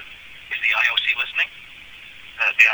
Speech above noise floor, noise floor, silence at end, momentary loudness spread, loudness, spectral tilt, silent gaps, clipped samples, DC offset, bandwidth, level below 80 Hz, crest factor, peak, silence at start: 22 dB; -41 dBFS; 0 s; 22 LU; -19 LUFS; 1 dB/octave; none; under 0.1%; under 0.1%; 19.5 kHz; -58 dBFS; 22 dB; 0 dBFS; 0 s